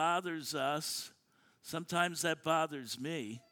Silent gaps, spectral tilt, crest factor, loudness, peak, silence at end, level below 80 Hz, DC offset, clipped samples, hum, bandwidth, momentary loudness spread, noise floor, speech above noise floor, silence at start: none; -3.5 dB/octave; 20 dB; -36 LUFS; -16 dBFS; 0.15 s; -82 dBFS; under 0.1%; under 0.1%; none; 19 kHz; 10 LU; -68 dBFS; 32 dB; 0 s